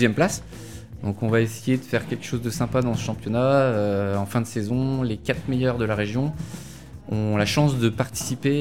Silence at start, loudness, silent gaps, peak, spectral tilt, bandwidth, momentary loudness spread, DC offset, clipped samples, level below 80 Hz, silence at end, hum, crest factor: 0 s; -24 LUFS; none; -4 dBFS; -6 dB/octave; 17 kHz; 12 LU; 0.5%; under 0.1%; -46 dBFS; 0 s; none; 18 dB